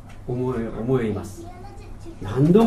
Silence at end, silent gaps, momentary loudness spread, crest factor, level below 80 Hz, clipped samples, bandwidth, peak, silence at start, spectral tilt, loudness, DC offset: 0 s; none; 19 LU; 20 dB; -40 dBFS; under 0.1%; 13.5 kHz; -2 dBFS; 0 s; -8.5 dB/octave; -24 LUFS; 0.1%